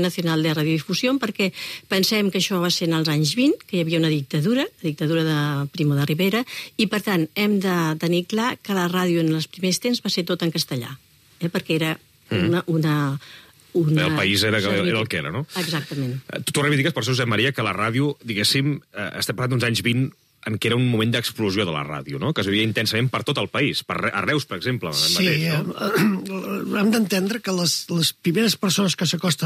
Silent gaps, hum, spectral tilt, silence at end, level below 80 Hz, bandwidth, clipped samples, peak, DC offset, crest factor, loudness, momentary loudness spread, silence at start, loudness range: none; none; -4.5 dB/octave; 0 s; -62 dBFS; 15.5 kHz; under 0.1%; -6 dBFS; under 0.1%; 16 dB; -22 LUFS; 7 LU; 0 s; 2 LU